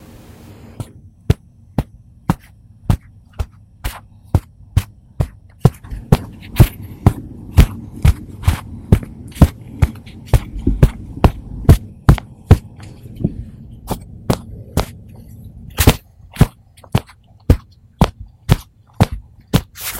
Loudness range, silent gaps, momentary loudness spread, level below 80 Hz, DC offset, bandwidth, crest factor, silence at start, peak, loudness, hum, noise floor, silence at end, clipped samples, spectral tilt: 8 LU; none; 19 LU; -22 dBFS; under 0.1%; 17 kHz; 18 dB; 1.3 s; 0 dBFS; -18 LUFS; none; -44 dBFS; 0 s; 0.5%; -6.5 dB/octave